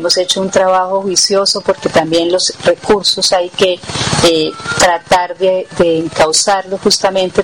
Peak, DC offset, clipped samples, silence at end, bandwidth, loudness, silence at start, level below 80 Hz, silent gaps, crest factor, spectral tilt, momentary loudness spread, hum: -2 dBFS; 0.3%; under 0.1%; 0 s; 17 kHz; -12 LUFS; 0 s; -42 dBFS; none; 10 dB; -2.5 dB/octave; 4 LU; none